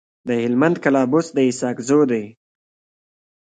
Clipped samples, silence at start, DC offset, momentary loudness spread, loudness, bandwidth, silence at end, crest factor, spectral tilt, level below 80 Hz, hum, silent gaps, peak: under 0.1%; 0.25 s; under 0.1%; 8 LU; -19 LUFS; 9.4 kHz; 1.15 s; 18 dB; -6 dB/octave; -66 dBFS; none; none; -2 dBFS